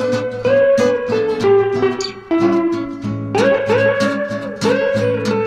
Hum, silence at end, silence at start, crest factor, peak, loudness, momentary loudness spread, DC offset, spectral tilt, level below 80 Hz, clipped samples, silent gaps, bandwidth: none; 0 s; 0 s; 12 dB; -4 dBFS; -16 LUFS; 8 LU; under 0.1%; -6 dB/octave; -50 dBFS; under 0.1%; none; 11.5 kHz